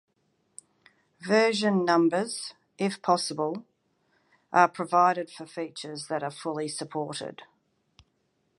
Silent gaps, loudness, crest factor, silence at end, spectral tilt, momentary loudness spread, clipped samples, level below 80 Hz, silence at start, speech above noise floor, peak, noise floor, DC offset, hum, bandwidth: none; -27 LUFS; 24 dB; 1.15 s; -4.5 dB/octave; 14 LU; under 0.1%; -76 dBFS; 1.2 s; 47 dB; -4 dBFS; -73 dBFS; under 0.1%; none; 11.5 kHz